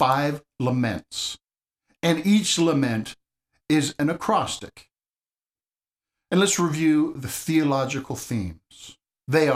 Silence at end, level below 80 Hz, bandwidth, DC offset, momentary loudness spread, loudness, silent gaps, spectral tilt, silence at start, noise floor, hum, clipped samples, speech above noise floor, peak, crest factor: 0 s; -56 dBFS; 15.5 kHz; under 0.1%; 15 LU; -23 LUFS; none; -4.5 dB/octave; 0 s; under -90 dBFS; none; under 0.1%; over 67 dB; -6 dBFS; 18 dB